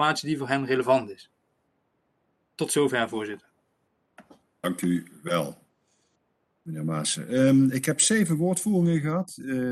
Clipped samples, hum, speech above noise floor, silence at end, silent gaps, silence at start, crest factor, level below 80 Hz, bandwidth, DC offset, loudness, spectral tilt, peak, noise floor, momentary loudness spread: under 0.1%; none; 48 dB; 0 s; none; 0 s; 20 dB; -66 dBFS; 12.5 kHz; under 0.1%; -25 LUFS; -4.5 dB/octave; -6 dBFS; -73 dBFS; 13 LU